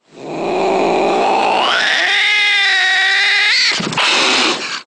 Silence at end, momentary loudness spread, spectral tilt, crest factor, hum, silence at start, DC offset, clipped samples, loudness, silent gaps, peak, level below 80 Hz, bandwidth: 0.05 s; 5 LU; -1.5 dB/octave; 14 dB; none; 0.15 s; under 0.1%; under 0.1%; -12 LUFS; none; 0 dBFS; -58 dBFS; 11 kHz